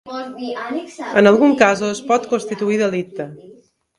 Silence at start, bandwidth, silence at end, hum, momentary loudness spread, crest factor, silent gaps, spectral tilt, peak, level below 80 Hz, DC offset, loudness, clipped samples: 0.05 s; 11.5 kHz; 0.45 s; none; 17 LU; 18 dB; none; -5 dB/octave; 0 dBFS; -62 dBFS; under 0.1%; -17 LUFS; under 0.1%